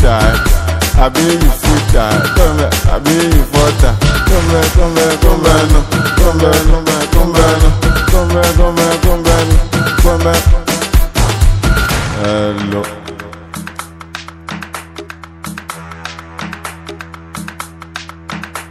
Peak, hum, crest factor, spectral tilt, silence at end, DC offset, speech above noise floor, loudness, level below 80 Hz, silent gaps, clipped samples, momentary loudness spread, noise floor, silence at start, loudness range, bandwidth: 0 dBFS; none; 10 dB; -5 dB/octave; 0 s; under 0.1%; 21 dB; -11 LUFS; -14 dBFS; none; 0.7%; 17 LU; -30 dBFS; 0 s; 15 LU; 16 kHz